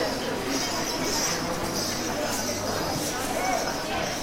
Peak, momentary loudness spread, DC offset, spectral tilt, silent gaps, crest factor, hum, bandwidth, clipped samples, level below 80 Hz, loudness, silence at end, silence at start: -14 dBFS; 3 LU; under 0.1%; -2.5 dB/octave; none; 14 dB; none; 16 kHz; under 0.1%; -46 dBFS; -27 LUFS; 0 s; 0 s